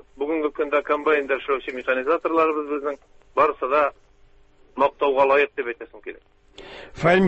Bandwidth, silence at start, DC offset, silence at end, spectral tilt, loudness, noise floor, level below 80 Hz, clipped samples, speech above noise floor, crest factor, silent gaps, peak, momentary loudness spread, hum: 8.4 kHz; 0.2 s; under 0.1%; 0 s; -7 dB/octave; -22 LUFS; -53 dBFS; -56 dBFS; under 0.1%; 31 dB; 18 dB; none; -6 dBFS; 19 LU; none